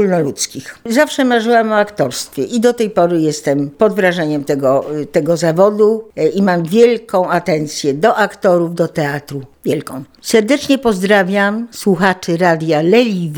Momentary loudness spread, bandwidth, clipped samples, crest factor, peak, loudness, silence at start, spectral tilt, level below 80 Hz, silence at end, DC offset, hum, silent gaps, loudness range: 8 LU; over 20 kHz; under 0.1%; 14 dB; 0 dBFS; -14 LUFS; 0 s; -5 dB/octave; -54 dBFS; 0 s; under 0.1%; none; none; 2 LU